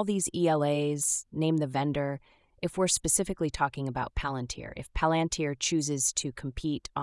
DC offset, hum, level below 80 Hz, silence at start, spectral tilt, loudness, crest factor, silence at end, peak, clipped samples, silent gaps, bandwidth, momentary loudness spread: under 0.1%; none; -46 dBFS; 0 s; -4 dB/octave; -29 LUFS; 18 dB; 0 s; -12 dBFS; under 0.1%; none; 12 kHz; 9 LU